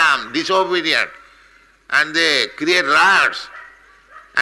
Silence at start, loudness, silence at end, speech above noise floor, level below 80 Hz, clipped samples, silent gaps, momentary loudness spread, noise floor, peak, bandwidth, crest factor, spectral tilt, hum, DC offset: 0 s; -15 LUFS; 0 s; 34 dB; -60 dBFS; under 0.1%; none; 11 LU; -50 dBFS; -4 dBFS; 12 kHz; 14 dB; -1.5 dB/octave; none; under 0.1%